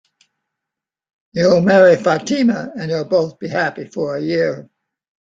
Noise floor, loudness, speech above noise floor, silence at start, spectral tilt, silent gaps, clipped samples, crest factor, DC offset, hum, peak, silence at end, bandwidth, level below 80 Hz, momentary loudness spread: -85 dBFS; -16 LUFS; 69 dB; 1.35 s; -6 dB/octave; none; under 0.1%; 16 dB; under 0.1%; none; -2 dBFS; 0.65 s; 7.6 kHz; -58 dBFS; 13 LU